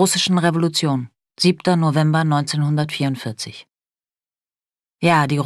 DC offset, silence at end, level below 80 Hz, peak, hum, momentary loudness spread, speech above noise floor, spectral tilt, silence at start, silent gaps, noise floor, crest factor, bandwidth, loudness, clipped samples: under 0.1%; 0 s; -64 dBFS; -2 dBFS; none; 11 LU; over 72 dB; -5 dB/octave; 0 s; none; under -90 dBFS; 16 dB; 13 kHz; -18 LUFS; under 0.1%